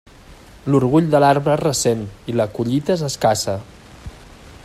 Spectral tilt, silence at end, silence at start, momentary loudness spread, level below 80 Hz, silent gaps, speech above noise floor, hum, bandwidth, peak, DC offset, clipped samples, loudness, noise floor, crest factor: -5.5 dB/octave; 0.1 s; 0.3 s; 20 LU; -46 dBFS; none; 26 dB; none; 15.5 kHz; -2 dBFS; under 0.1%; under 0.1%; -18 LUFS; -43 dBFS; 18 dB